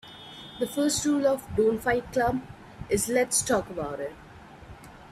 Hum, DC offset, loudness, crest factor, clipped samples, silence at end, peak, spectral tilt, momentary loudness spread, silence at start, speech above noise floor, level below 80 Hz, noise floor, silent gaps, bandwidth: none; under 0.1%; -26 LUFS; 16 dB; under 0.1%; 0 s; -12 dBFS; -3.5 dB/octave; 23 LU; 0.05 s; 21 dB; -52 dBFS; -47 dBFS; none; 15.5 kHz